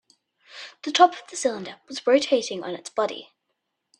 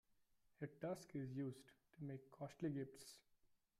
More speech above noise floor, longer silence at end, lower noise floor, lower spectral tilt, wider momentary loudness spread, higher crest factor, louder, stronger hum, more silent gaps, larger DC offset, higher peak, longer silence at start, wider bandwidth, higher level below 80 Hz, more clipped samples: first, 55 dB vs 28 dB; first, 0.75 s vs 0.35 s; about the same, -78 dBFS vs -79 dBFS; second, -2.5 dB/octave vs -7 dB/octave; first, 18 LU vs 14 LU; first, 24 dB vs 18 dB; first, -23 LUFS vs -51 LUFS; neither; neither; neither; first, -2 dBFS vs -36 dBFS; about the same, 0.55 s vs 0.6 s; second, 11 kHz vs 15.5 kHz; first, -76 dBFS vs -84 dBFS; neither